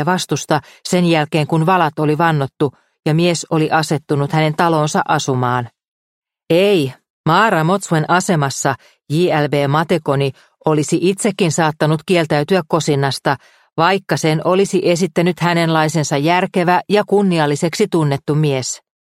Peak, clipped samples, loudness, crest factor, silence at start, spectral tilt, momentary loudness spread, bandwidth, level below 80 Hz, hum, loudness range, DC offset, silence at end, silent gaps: 0 dBFS; under 0.1%; -16 LUFS; 16 dB; 0 s; -5.5 dB/octave; 6 LU; 15 kHz; -58 dBFS; none; 2 LU; under 0.1%; 0.25 s; 5.88-6.22 s, 7.10-7.24 s